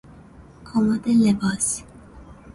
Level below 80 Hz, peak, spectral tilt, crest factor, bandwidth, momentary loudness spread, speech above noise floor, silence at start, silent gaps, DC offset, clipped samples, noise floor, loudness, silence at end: -48 dBFS; -8 dBFS; -5 dB/octave; 16 dB; 11.5 kHz; 8 LU; 26 dB; 0.6 s; none; under 0.1%; under 0.1%; -46 dBFS; -21 LUFS; 0.2 s